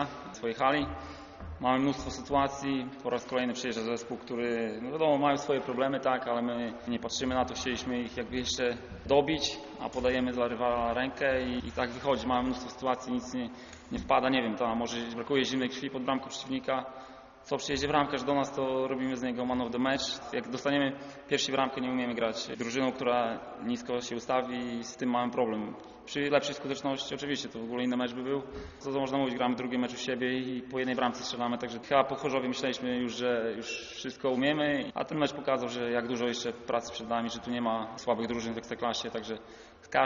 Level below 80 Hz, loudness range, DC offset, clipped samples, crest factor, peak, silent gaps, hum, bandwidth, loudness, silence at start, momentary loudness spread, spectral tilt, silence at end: -58 dBFS; 2 LU; under 0.1%; under 0.1%; 22 dB; -10 dBFS; none; none; 7.4 kHz; -32 LUFS; 0 s; 9 LU; -3 dB/octave; 0 s